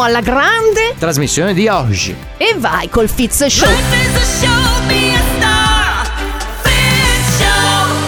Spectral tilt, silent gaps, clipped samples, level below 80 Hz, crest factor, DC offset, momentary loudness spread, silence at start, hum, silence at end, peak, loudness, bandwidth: -3.5 dB/octave; none; under 0.1%; -20 dBFS; 12 dB; under 0.1%; 5 LU; 0 s; none; 0 s; 0 dBFS; -12 LUFS; over 20 kHz